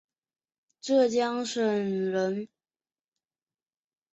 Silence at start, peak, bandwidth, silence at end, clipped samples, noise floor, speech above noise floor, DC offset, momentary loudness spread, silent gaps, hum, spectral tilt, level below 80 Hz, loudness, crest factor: 0.85 s; -12 dBFS; 8.2 kHz; 1.65 s; under 0.1%; under -90 dBFS; over 64 dB; under 0.1%; 13 LU; none; none; -5 dB/octave; -76 dBFS; -27 LUFS; 18 dB